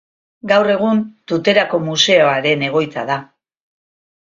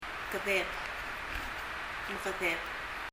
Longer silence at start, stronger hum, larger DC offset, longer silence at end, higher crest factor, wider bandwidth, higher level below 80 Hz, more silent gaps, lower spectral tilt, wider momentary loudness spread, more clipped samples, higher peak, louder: first, 0.45 s vs 0 s; neither; neither; first, 1.05 s vs 0.05 s; about the same, 16 dB vs 18 dB; second, 7.6 kHz vs 16 kHz; second, -62 dBFS vs -52 dBFS; neither; about the same, -4 dB/octave vs -3 dB/octave; first, 10 LU vs 7 LU; neither; first, 0 dBFS vs -18 dBFS; first, -15 LUFS vs -35 LUFS